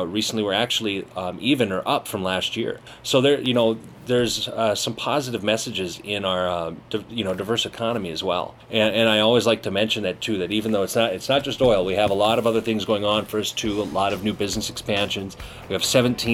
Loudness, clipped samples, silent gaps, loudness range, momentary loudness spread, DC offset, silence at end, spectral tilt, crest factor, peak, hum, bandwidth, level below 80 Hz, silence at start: -22 LUFS; under 0.1%; none; 4 LU; 8 LU; under 0.1%; 0 s; -4 dB/octave; 18 dB; -4 dBFS; none; 16.5 kHz; -50 dBFS; 0 s